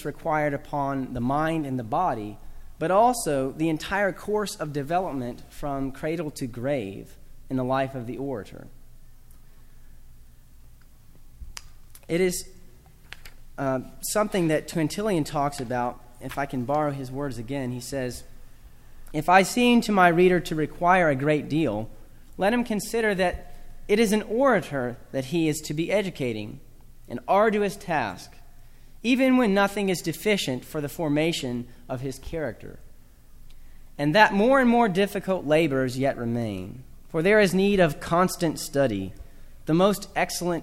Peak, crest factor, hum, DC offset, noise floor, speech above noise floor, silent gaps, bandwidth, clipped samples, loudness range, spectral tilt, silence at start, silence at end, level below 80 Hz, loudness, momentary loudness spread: -2 dBFS; 22 dB; none; under 0.1%; -48 dBFS; 24 dB; none; 16.5 kHz; under 0.1%; 9 LU; -5.5 dB/octave; 0 s; 0 s; -46 dBFS; -25 LUFS; 16 LU